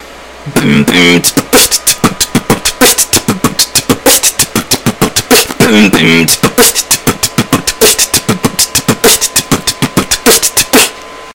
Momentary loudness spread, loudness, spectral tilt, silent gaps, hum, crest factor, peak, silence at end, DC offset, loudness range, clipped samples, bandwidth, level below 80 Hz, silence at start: 6 LU; -7 LUFS; -2.5 dB/octave; none; none; 10 dB; 0 dBFS; 0 s; under 0.1%; 1 LU; 3%; over 20 kHz; -34 dBFS; 0 s